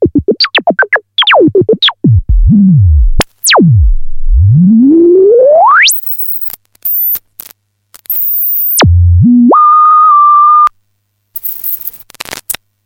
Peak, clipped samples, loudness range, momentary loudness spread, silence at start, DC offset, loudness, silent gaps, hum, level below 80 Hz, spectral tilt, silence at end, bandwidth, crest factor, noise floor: 0 dBFS; under 0.1%; 3 LU; 13 LU; 0 s; under 0.1%; -7 LUFS; none; none; -16 dBFS; -5 dB/octave; 0.3 s; 17 kHz; 8 dB; -61 dBFS